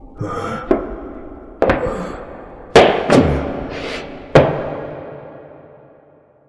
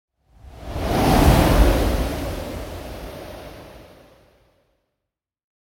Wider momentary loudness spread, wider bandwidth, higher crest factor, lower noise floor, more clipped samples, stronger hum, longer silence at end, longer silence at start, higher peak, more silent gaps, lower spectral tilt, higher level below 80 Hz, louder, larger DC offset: about the same, 22 LU vs 23 LU; second, 11 kHz vs 17 kHz; about the same, 18 dB vs 20 dB; second, -50 dBFS vs -83 dBFS; neither; neither; second, 0.9 s vs 1.8 s; second, 0 s vs 0.45 s; about the same, 0 dBFS vs -2 dBFS; neither; about the same, -6 dB/octave vs -6 dB/octave; second, -34 dBFS vs -26 dBFS; first, -17 LUFS vs -20 LUFS; neither